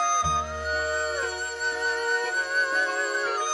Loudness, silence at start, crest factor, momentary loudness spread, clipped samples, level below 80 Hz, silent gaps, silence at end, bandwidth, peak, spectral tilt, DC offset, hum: -26 LUFS; 0 s; 14 dB; 5 LU; under 0.1%; -48 dBFS; none; 0 s; 15 kHz; -12 dBFS; -1.5 dB/octave; under 0.1%; none